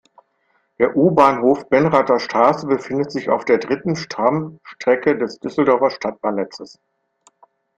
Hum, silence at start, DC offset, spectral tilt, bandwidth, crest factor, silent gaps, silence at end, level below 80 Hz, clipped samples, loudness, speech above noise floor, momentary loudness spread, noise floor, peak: none; 0.8 s; under 0.1%; -6.5 dB/octave; 8.6 kHz; 18 dB; none; 1.1 s; -58 dBFS; under 0.1%; -18 LUFS; 47 dB; 10 LU; -65 dBFS; 0 dBFS